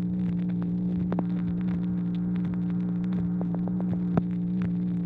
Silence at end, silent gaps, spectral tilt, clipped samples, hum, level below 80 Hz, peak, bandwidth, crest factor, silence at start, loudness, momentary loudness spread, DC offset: 0 s; none; -11.5 dB/octave; under 0.1%; none; -50 dBFS; -10 dBFS; 3.9 kHz; 18 dB; 0 s; -28 LUFS; 1 LU; under 0.1%